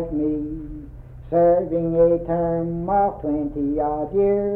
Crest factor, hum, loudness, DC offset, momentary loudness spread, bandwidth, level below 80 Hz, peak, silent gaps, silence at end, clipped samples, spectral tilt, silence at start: 14 dB; none; -21 LUFS; under 0.1%; 13 LU; 2.9 kHz; -40 dBFS; -6 dBFS; none; 0 s; under 0.1%; -12.5 dB/octave; 0 s